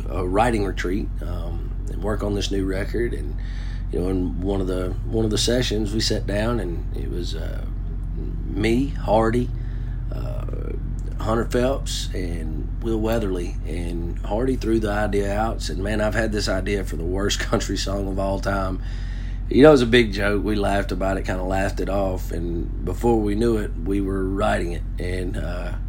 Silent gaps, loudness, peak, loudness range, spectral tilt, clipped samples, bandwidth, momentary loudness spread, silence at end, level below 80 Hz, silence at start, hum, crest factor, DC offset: none; -24 LUFS; 0 dBFS; 6 LU; -5.5 dB/octave; under 0.1%; 16.5 kHz; 10 LU; 0 s; -28 dBFS; 0 s; none; 22 dB; under 0.1%